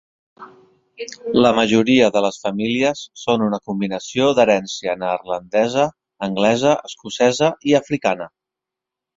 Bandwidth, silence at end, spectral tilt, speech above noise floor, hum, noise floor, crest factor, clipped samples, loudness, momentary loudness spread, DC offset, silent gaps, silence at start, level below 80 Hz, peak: 7.8 kHz; 0.9 s; -5 dB/octave; 67 dB; none; -85 dBFS; 18 dB; under 0.1%; -18 LUFS; 11 LU; under 0.1%; none; 0.4 s; -56 dBFS; -2 dBFS